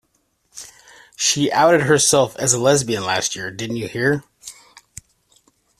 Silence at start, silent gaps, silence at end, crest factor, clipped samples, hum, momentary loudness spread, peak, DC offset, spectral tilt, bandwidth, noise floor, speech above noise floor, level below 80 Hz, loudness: 0.55 s; none; 1.3 s; 18 dB; under 0.1%; none; 23 LU; -2 dBFS; under 0.1%; -3 dB/octave; 14.5 kHz; -66 dBFS; 49 dB; -56 dBFS; -17 LUFS